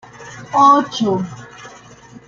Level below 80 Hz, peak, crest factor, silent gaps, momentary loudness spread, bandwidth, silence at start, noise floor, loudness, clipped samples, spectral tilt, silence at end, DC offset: -58 dBFS; -2 dBFS; 16 dB; none; 24 LU; 7.6 kHz; 0.2 s; -41 dBFS; -14 LUFS; under 0.1%; -5 dB/octave; 0.6 s; under 0.1%